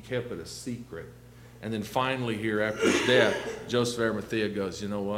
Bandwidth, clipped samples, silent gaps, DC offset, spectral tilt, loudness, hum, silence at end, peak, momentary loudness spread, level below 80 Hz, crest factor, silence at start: 16.5 kHz; under 0.1%; none; under 0.1%; -4.5 dB/octave; -28 LUFS; 60 Hz at -45 dBFS; 0 s; -6 dBFS; 16 LU; -58 dBFS; 22 dB; 0 s